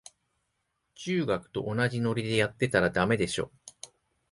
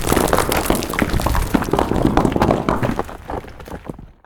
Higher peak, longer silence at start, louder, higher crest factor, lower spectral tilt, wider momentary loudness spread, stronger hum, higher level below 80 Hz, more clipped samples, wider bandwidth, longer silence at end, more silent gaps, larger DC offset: second, -10 dBFS vs -2 dBFS; first, 1 s vs 0 s; second, -28 LUFS vs -18 LUFS; about the same, 20 dB vs 18 dB; about the same, -5.5 dB/octave vs -5.5 dB/octave; first, 20 LU vs 16 LU; neither; second, -56 dBFS vs -28 dBFS; neither; second, 11.5 kHz vs 19 kHz; first, 0.45 s vs 0.2 s; neither; neither